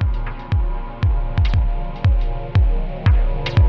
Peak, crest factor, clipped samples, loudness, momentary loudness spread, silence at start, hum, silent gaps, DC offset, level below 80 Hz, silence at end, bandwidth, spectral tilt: -6 dBFS; 12 dB; under 0.1%; -21 LUFS; 5 LU; 0 s; none; none; under 0.1%; -18 dBFS; 0 s; 6 kHz; -8.5 dB/octave